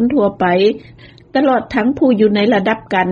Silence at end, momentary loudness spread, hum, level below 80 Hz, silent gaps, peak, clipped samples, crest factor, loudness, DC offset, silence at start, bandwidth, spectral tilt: 0 s; 5 LU; none; -48 dBFS; none; -2 dBFS; under 0.1%; 12 dB; -14 LUFS; under 0.1%; 0 s; 7 kHz; -7.5 dB/octave